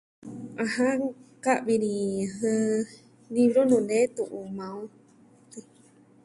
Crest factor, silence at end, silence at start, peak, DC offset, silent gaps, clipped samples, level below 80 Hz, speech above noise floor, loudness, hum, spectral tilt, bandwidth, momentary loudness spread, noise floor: 18 dB; 0.65 s; 0.25 s; -10 dBFS; under 0.1%; none; under 0.1%; -70 dBFS; 31 dB; -26 LUFS; none; -5.5 dB/octave; 11.5 kHz; 21 LU; -57 dBFS